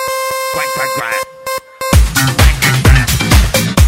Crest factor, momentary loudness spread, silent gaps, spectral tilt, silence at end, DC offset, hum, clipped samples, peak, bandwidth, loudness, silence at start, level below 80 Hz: 12 dB; 10 LU; none; -4 dB/octave; 0 s; under 0.1%; none; 0.4%; 0 dBFS; 16.5 kHz; -12 LUFS; 0 s; -16 dBFS